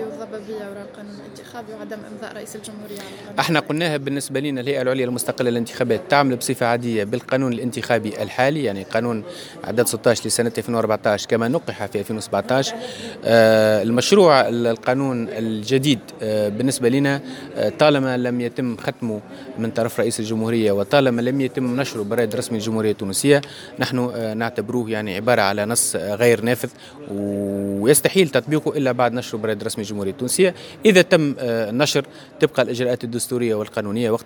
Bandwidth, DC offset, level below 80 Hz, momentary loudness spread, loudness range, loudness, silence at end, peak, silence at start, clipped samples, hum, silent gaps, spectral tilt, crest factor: 19.5 kHz; under 0.1%; -62 dBFS; 15 LU; 5 LU; -20 LUFS; 0.05 s; 0 dBFS; 0 s; under 0.1%; none; none; -4.5 dB/octave; 20 dB